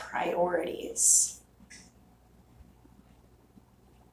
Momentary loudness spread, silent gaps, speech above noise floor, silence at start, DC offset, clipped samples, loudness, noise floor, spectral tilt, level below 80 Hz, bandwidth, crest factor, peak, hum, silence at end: 13 LU; none; 32 dB; 0 s; under 0.1%; under 0.1%; -25 LUFS; -60 dBFS; -1.5 dB/octave; -62 dBFS; 16 kHz; 24 dB; -10 dBFS; 60 Hz at -60 dBFS; 2.3 s